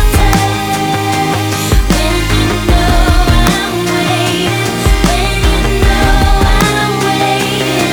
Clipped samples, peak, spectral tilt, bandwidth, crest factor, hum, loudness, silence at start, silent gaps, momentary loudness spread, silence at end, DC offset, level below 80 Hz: under 0.1%; 0 dBFS; -4.5 dB/octave; over 20 kHz; 10 dB; none; -11 LUFS; 0 s; none; 3 LU; 0 s; under 0.1%; -14 dBFS